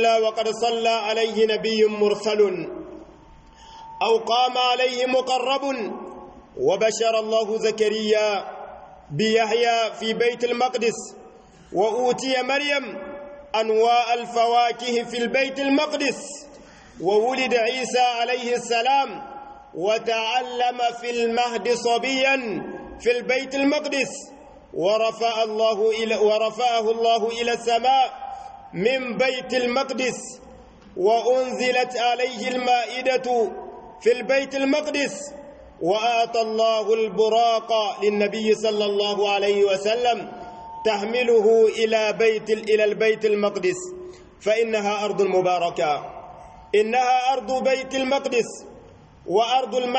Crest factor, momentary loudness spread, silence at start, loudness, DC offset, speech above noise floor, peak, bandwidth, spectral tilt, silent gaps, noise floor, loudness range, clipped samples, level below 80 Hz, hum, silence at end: 14 dB; 15 LU; 0 s; -22 LUFS; under 0.1%; 27 dB; -8 dBFS; 8.8 kHz; -3 dB/octave; none; -48 dBFS; 3 LU; under 0.1%; -60 dBFS; none; 0 s